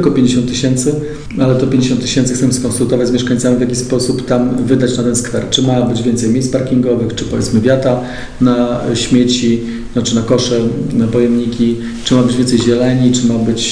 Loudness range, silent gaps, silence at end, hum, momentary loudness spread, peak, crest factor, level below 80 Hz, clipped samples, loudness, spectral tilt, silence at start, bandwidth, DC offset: 1 LU; none; 0 s; none; 4 LU; 0 dBFS; 12 dB; -34 dBFS; under 0.1%; -13 LUFS; -5.5 dB/octave; 0 s; 10.5 kHz; 1%